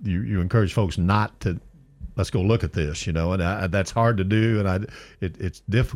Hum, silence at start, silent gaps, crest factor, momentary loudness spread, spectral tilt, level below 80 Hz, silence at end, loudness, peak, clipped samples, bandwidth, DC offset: none; 0 s; none; 14 dB; 11 LU; -7 dB/octave; -38 dBFS; 0 s; -24 LUFS; -8 dBFS; under 0.1%; 13 kHz; under 0.1%